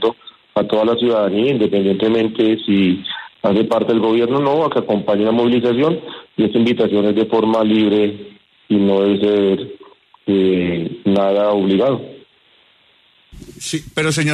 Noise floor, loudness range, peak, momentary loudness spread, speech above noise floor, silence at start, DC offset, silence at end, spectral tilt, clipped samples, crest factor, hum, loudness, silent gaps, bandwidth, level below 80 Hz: -54 dBFS; 2 LU; -4 dBFS; 8 LU; 39 dB; 0 s; under 0.1%; 0 s; -6 dB/octave; under 0.1%; 14 dB; none; -16 LUFS; none; 12.5 kHz; -54 dBFS